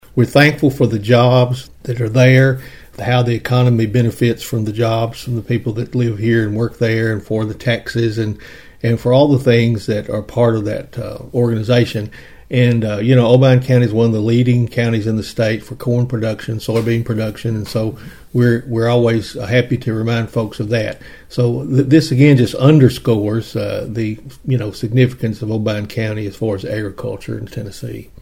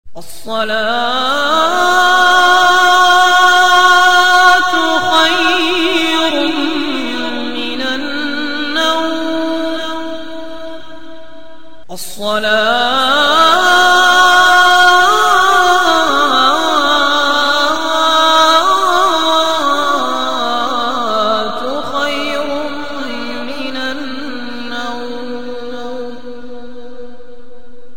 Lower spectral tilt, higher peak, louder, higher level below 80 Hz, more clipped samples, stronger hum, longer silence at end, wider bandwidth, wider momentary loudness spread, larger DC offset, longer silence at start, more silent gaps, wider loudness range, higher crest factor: first, -7.5 dB/octave vs -1.5 dB/octave; about the same, 0 dBFS vs 0 dBFS; second, -16 LUFS vs -11 LUFS; about the same, -44 dBFS vs -48 dBFS; neither; neither; about the same, 0 s vs 0 s; about the same, 16 kHz vs 16.5 kHz; second, 13 LU vs 17 LU; second, 0.6% vs 6%; about the same, 0.15 s vs 0.05 s; neither; second, 5 LU vs 14 LU; about the same, 16 dB vs 12 dB